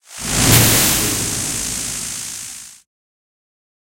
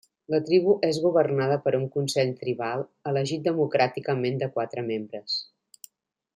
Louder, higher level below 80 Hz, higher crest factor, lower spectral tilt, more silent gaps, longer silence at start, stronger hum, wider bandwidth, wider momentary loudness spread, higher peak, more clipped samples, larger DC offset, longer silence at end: first, -15 LUFS vs -26 LUFS; first, -36 dBFS vs -72 dBFS; about the same, 20 dB vs 18 dB; second, -2.5 dB/octave vs -6 dB/octave; neither; second, 0.1 s vs 0.3 s; neither; about the same, 16.5 kHz vs 16 kHz; first, 17 LU vs 8 LU; first, 0 dBFS vs -8 dBFS; neither; neither; first, 1.15 s vs 0.95 s